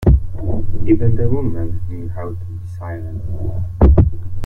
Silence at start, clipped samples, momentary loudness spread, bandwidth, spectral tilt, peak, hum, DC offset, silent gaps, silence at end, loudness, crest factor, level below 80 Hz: 0 s; under 0.1%; 14 LU; 2.9 kHz; -11 dB/octave; 0 dBFS; none; under 0.1%; none; 0 s; -19 LUFS; 14 dB; -20 dBFS